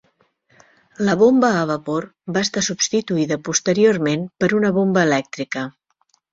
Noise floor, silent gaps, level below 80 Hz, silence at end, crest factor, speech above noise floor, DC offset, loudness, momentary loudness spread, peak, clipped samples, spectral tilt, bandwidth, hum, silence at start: -65 dBFS; none; -60 dBFS; 0.6 s; 18 dB; 46 dB; under 0.1%; -19 LUFS; 11 LU; -2 dBFS; under 0.1%; -4.5 dB/octave; 7.8 kHz; none; 1 s